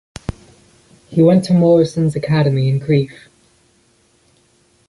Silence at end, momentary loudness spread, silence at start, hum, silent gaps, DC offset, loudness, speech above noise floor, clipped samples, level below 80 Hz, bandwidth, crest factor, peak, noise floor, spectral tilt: 1.75 s; 17 LU; 0.3 s; none; none; under 0.1%; -15 LUFS; 43 dB; under 0.1%; -44 dBFS; 11.5 kHz; 16 dB; -2 dBFS; -56 dBFS; -8 dB/octave